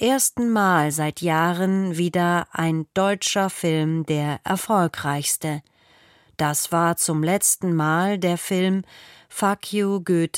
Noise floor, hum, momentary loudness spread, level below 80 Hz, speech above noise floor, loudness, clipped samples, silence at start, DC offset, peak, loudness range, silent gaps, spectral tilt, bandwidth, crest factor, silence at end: -55 dBFS; none; 6 LU; -62 dBFS; 34 dB; -22 LUFS; under 0.1%; 0 s; under 0.1%; -6 dBFS; 2 LU; none; -4.5 dB/octave; 16.5 kHz; 16 dB; 0 s